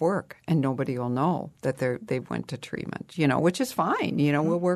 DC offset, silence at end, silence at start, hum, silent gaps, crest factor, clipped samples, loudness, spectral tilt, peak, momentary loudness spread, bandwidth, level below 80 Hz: under 0.1%; 0 s; 0 s; none; none; 16 dB; under 0.1%; -27 LUFS; -6.5 dB/octave; -10 dBFS; 11 LU; 13.5 kHz; -64 dBFS